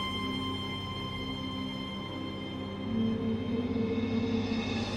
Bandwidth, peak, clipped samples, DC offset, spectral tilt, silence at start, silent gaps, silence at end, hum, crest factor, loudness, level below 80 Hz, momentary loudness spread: 12 kHz; -20 dBFS; under 0.1%; under 0.1%; -6 dB/octave; 0 s; none; 0 s; 50 Hz at -55 dBFS; 14 dB; -33 LUFS; -52 dBFS; 7 LU